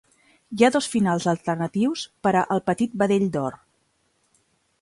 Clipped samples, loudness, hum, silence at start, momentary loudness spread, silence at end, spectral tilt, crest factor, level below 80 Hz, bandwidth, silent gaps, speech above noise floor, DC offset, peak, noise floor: under 0.1%; -23 LUFS; none; 0.5 s; 6 LU; 1.25 s; -5.5 dB/octave; 20 dB; -62 dBFS; 11.5 kHz; none; 46 dB; under 0.1%; -4 dBFS; -68 dBFS